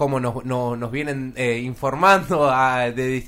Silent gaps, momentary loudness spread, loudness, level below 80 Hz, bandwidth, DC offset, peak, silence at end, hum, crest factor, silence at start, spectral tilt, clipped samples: none; 10 LU; -20 LUFS; -46 dBFS; 16 kHz; under 0.1%; -2 dBFS; 0 s; none; 18 dB; 0 s; -6 dB/octave; under 0.1%